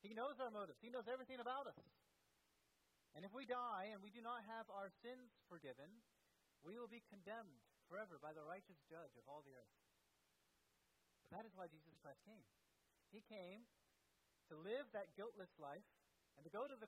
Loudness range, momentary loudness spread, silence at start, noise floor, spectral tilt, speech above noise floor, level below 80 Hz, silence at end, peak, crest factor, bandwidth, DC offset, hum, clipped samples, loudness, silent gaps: 10 LU; 15 LU; 0.05 s; -83 dBFS; -5.5 dB/octave; 29 dB; under -90 dBFS; 0 s; -36 dBFS; 20 dB; 14.5 kHz; under 0.1%; none; under 0.1%; -55 LUFS; none